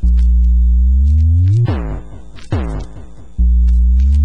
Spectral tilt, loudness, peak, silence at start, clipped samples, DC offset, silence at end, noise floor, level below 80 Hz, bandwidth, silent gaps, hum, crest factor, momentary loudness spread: -9 dB/octave; -14 LUFS; -4 dBFS; 0.05 s; under 0.1%; 3%; 0 s; -34 dBFS; -12 dBFS; 4 kHz; none; none; 8 dB; 15 LU